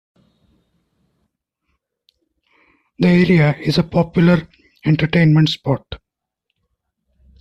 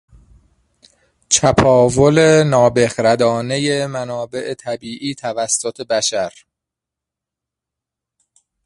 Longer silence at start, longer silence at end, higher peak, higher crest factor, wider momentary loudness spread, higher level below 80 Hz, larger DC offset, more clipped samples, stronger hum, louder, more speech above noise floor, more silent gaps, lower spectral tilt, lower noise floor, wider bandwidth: first, 3 s vs 1.3 s; second, 1.45 s vs 2.35 s; about the same, -2 dBFS vs 0 dBFS; about the same, 16 dB vs 18 dB; about the same, 11 LU vs 13 LU; about the same, -46 dBFS vs -44 dBFS; neither; neither; neither; about the same, -16 LUFS vs -16 LUFS; second, 62 dB vs 69 dB; neither; first, -7.5 dB/octave vs -4 dB/octave; second, -77 dBFS vs -84 dBFS; second, 7.8 kHz vs 11.5 kHz